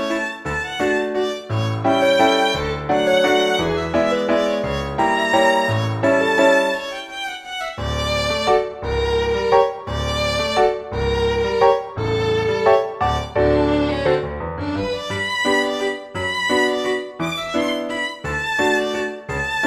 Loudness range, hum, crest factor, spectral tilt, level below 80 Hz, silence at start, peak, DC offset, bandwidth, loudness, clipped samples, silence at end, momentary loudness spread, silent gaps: 3 LU; none; 18 dB; -5 dB/octave; -36 dBFS; 0 s; -2 dBFS; under 0.1%; 14.5 kHz; -19 LUFS; under 0.1%; 0 s; 9 LU; none